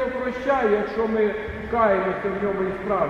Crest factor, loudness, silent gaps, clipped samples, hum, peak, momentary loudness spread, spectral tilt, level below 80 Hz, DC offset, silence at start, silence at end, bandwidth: 16 dB; -23 LUFS; none; under 0.1%; none; -6 dBFS; 6 LU; -7.5 dB/octave; -46 dBFS; under 0.1%; 0 s; 0 s; 7.6 kHz